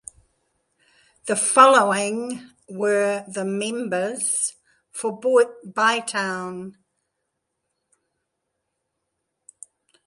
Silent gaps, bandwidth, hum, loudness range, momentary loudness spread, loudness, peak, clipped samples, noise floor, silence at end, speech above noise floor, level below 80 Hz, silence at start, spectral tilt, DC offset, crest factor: none; 12 kHz; none; 8 LU; 22 LU; -21 LUFS; -2 dBFS; under 0.1%; -78 dBFS; 3.35 s; 57 dB; -72 dBFS; 1.25 s; -2.5 dB/octave; under 0.1%; 22 dB